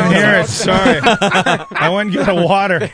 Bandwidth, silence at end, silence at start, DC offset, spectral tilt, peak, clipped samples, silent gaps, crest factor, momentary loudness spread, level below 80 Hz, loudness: 10.5 kHz; 0 s; 0 s; under 0.1%; -4.5 dB/octave; 0 dBFS; under 0.1%; none; 12 dB; 5 LU; -40 dBFS; -13 LUFS